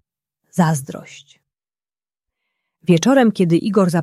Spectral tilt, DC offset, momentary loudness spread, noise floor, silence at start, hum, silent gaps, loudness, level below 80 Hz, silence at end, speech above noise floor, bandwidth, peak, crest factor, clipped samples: -6.5 dB/octave; under 0.1%; 14 LU; under -90 dBFS; 0.55 s; none; none; -16 LUFS; -64 dBFS; 0 s; over 74 dB; 14.5 kHz; -2 dBFS; 16 dB; under 0.1%